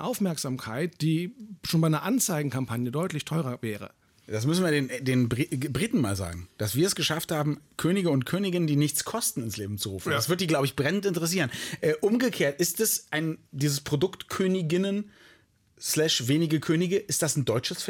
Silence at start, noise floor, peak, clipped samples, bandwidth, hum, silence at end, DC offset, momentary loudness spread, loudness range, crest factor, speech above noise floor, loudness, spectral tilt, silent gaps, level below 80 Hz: 0 s; -61 dBFS; -14 dBFS; under 0.1%; 18 kHz; none; 0 s; under 0.1%; 8 LU; 2 LU; 14 dB; 34 dB; -27 LUFS; -4.5 dB/octave; none; -60 dBFS